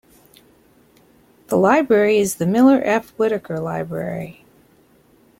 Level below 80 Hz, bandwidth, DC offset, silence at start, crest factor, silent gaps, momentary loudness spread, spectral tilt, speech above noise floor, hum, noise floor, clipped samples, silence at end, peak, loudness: -58 dBFS; 16.5 kHz; under 0.1%; 1.5 s; 18 dB; none; 12 LU; -6 dB/octave; 37 dB; none; -54 dBFS; under 0.1%; 1.1 s; -2 dBFS; -18 LUFS